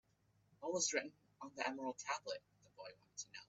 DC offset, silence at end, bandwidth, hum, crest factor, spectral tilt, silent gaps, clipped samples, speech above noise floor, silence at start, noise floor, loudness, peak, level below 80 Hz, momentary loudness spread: under 0.1%; 0.05 s; 8.4 kHz; none; 24 dB; -1.5 dB/octave; none; under 0.1%; 33 dB; 0.6 s; -77 dBFS; -43 LUFS; -22 dBFS; -86 dBFS; 19 LU